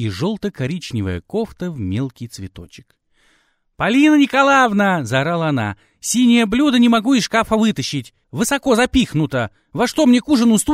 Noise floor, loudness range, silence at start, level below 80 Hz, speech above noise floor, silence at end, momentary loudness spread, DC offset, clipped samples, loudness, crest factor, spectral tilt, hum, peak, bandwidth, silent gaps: -61 dBFS; 10 LU; 0 s; -42 dBFS; 44 dB; 0 s; 13 LU; under 0.1%; under 0.1%; -17 LUFS; 14 dB; -5 dB/octave; none; -2 dBFS; 16 kHz; none